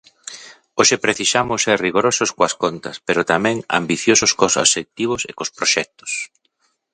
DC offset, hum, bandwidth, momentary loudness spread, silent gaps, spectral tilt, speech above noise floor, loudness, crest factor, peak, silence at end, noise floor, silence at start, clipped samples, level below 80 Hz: under 0.1%; none; 11 kHz; 13 LU; none; -2 dB/octave; 48 dB; -17 LUFS; 20 dB; 0 dBFS; 0.65 s; -66 dBFS; 0.25 s; under 0.1%; -54 dBFS